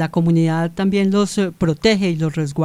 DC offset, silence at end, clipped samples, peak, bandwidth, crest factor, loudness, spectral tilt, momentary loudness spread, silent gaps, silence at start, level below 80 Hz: 0.4%; 0 s; under 0.1%; -2 dBFS; 12.5 kHz; 14 dB; -18 LUFS; -6.5 dB/octave; 4 LU; none; 0 s; -46 dBFS